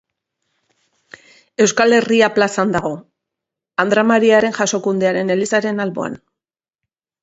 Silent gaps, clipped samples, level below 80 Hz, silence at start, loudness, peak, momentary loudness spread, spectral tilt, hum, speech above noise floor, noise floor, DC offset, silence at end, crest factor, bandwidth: none; under 0.1%; -58 dBFS; 1.6 s; -16 LUFS; 0 dBFS; 14 LU; -4 dB/octave; none; 71 dB; -86 dBFS; under 0.1%; 1.05 s; 18 dB; 8 kHz